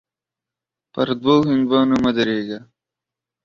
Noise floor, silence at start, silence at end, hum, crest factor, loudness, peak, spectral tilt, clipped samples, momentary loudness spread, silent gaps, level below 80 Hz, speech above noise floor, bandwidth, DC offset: -87 dBFS; 0.95 s; 0.85 s; none; 18 dB; -18 LUFS; -2 dBFS; -7 dB/octave; under 0.1%; 15 LU; none; -54 dBFS; 70 dB; 7.2 kHz; under 0.1%